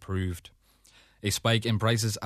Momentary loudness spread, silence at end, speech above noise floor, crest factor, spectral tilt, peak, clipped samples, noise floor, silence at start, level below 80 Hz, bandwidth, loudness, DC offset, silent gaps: 10 LU; 0 s; 32 dB; 18 dB; -4.5 dB/octave; -12 dBFS; under 0.1%; -60 dBFS; 0 s; -54 dBFS; 14 kHz; -28 LUFS; under 0.1%; none